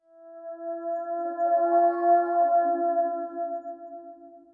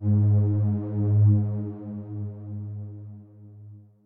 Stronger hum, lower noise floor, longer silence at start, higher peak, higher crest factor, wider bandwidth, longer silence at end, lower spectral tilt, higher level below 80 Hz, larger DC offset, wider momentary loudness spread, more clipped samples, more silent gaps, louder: neither; about the same, -47 dBFS vs -47 dBFS; first, 0.2 s vs 0 s; about the same, -12 dBFS vs -12 dBFS; about the same, 14 dB vs 14 dB; first, 1.9 kHz vs 1.6 kHz; about the same, 0.15 s vs 0.25 s; second, -8 dB/octave vs -14.5 dB/octave; second, -90 dBFS vs -60 dBFS; neither; about the same, 20 LU vs 19 LU; neither; neither; about the same, -25 LUFS vs -25 LUFS